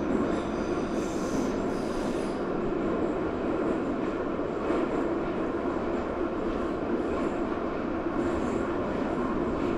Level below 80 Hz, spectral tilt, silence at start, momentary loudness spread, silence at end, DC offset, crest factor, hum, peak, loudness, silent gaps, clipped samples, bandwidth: -44 dBFS; -6.5 dB/octave; 0 s; 2 LU; 0 s; under 0.1%; 14 dB; none; -16 dBFS; -30 LUFS; none; under 0.1%; 12 kHz